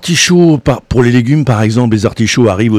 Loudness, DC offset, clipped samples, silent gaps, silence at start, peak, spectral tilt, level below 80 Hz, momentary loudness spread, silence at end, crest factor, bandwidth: -10 LUFS; 0.5%; 0.2%; none; 0 s; 0 dBFS; -5.5 dB/octave; -32 dBFS; 5 LU; 0 s; 10 dB; 14.5 kHz